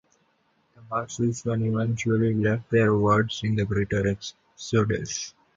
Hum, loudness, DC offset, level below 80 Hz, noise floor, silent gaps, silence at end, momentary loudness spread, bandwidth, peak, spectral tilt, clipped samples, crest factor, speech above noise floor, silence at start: none; -25 LUFS; under 0.1%; -50 dBFS; -68 dBFS; none; 0.25 s; 10 LU; 7.8 kHz; -8 dBFS; -6 dB/octave; under 0.1%; 18 dB; 43 dB; 0.8 s